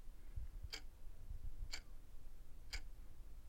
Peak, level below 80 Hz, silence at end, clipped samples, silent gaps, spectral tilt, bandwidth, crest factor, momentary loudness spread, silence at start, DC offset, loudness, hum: -30 dBFS; -52 dBFS; 0 s; under 0.1%; none; -2.5 dB/octave; 16.5 kHz; 18 dB; 11 LU; 0 s; under 0.1%; -55 LUFS; none